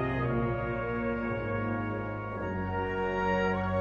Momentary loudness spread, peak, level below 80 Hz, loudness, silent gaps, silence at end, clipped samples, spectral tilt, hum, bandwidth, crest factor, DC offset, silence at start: 6 LU; -16 dBFS; -46 dBFS; -32 LUFS; none; 0 s; under 0.1%; -8.5 dB/octave; none; 7 kHz; 14 dB; under 0.1%; 0 s